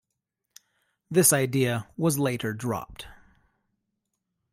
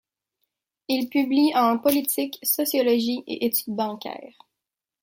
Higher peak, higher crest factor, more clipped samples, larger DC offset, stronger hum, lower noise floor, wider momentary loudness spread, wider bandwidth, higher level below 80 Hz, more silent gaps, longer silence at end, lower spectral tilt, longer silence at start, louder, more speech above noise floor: second, -6 dBFS vs -2 dBFS; about the same, 22 dB vs 22 dB; neither; neither; neither; second, -83 dBFS vs -87 dBFS; first, 21 LU vs 12 LU; about the same, 16 kHz vs 17 kHz; first, -60 dBFS vs -70 dBFS; neither; first, 1.4 s vs 0.75 s; first, -4.5 dB/octave vs -3 dB/octave; first, 1.1 s vs 0.9 s; about the same, -25 LUFS vs -23 LUFS; second, 58 dB vs 64 dB